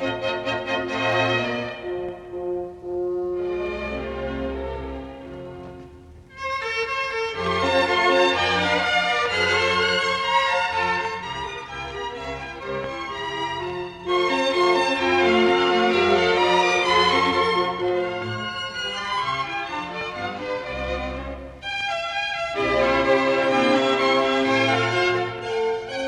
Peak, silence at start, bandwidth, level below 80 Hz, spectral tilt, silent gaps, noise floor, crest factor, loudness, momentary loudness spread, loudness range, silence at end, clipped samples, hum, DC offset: -6 dBFS; 0 s; 11 kHz; -46 dBFS; -4 dB/octave; none; -44 dBFS; 18 dB; -22 LUFS; 13 LU; 10 LU; 0 s; under 0.1%; none; under 0.1%